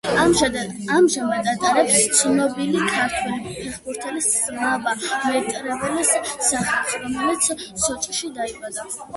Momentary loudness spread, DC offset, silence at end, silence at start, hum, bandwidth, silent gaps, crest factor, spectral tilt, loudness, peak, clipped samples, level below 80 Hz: 12 LU; under 0.1%; 0 s; 0.05 s; none; 12 kHz; none; 18 dB; -2.5 dB/octave; -20 LUFS; -2 dBFS; under 0.1%; -50 dBFS